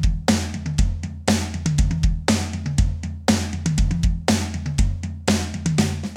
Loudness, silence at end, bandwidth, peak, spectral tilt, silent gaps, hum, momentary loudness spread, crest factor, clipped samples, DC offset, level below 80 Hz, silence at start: -22 LUFS; 0 s; 15.5 kHz; -2 dBFS; -5 dB/octave; none; none; 4 LU; 20 dB; under 0.1%; under 0.1%; -26 dBFS; 0 s